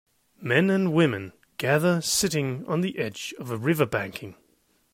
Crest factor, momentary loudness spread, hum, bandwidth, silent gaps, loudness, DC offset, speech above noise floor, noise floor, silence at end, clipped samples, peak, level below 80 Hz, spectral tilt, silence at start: 18 dB; 13 LU; none; 16 kHz; none; -25 LUFS; under 0.1%; 41 dB; -66 dBFS; 0.6 s; under 0.1%; -8 dBFS; -62 dBFS; -4.5 dB/octave; 0.4 s